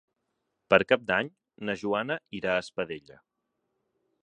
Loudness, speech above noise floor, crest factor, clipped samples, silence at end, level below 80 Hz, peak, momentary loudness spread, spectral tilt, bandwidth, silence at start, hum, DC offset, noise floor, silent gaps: -28 LUFS; 52 dB; 28 dB; under 0.1%; 1.25 s; -64 dBFS; -2 dBFS; 14 LU; -5.5 dB/octave; 9.8 kHz; 0.7 s; none; under 0.1%; -80 dBFS; none